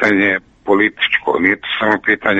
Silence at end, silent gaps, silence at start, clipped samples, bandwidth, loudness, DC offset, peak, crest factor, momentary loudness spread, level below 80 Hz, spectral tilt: 0 s; none; 0 s; under 0.1%; 8 kHz; -15 LUFS; under 0.1%; 0 dBFS; 16 dB; 3 LU; -52 dBFS; -5.5 dB/octave